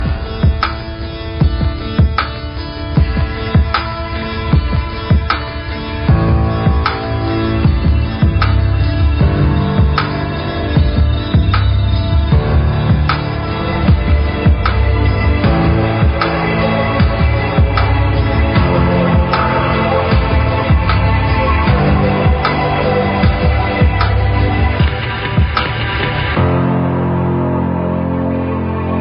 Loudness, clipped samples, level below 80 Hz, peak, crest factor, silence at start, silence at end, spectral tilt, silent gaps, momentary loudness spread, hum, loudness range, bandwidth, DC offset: -14 LUFS; under 0.1%; -18 dBFS; 0 dBFS; 12 dB; 0 s; 0 s; -6 dB/octave; none; 6 LU; none; 3 LU; 5.6 kHz; under 0.1%